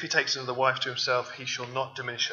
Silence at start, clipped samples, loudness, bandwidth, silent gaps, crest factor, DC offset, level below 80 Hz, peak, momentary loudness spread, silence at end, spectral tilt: 0 s; under 0.1%; -28 LUFS; 7.6 kHz; none; 22 dB; under 0.1%; -82 dBFS; -8 dBFS; 7 LU; 0 s; -2 dB/octave